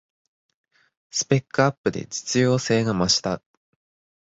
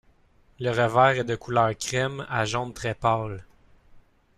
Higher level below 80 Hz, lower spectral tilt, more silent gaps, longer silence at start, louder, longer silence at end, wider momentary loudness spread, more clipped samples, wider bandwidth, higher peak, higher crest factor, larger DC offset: about the same, -54 dBFS vs -52 dBFS; about the same, -4 dB/octave vs -5 dB/octave; first, 1.78-1.84 s vs none; first, 1.15 s vs 0.6 s; first, -22 LUFS vs -25 LUFS; first, 0.85 s vs 0.4 s; about the same, 9 LU vs 11 LU; neither; second, 8 kHz vs 14 kHz; about the same, -4 dBFS vs -6 dBFS; about the same, 22 dB vs 20 dB; neither